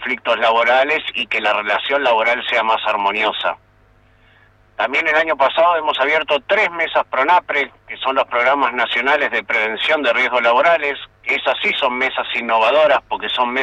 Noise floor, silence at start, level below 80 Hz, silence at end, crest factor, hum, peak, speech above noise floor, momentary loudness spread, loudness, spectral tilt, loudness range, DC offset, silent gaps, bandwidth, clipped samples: -52 dBFS; 0 s; -58 dBFS; 0 s; 14 dB; none; -4 dBFS; 35 dB; 6 LU; -16 LUFS; -3 dB/octave; 3 LU; under 0.1%; none; 9 kHz; under 0.1%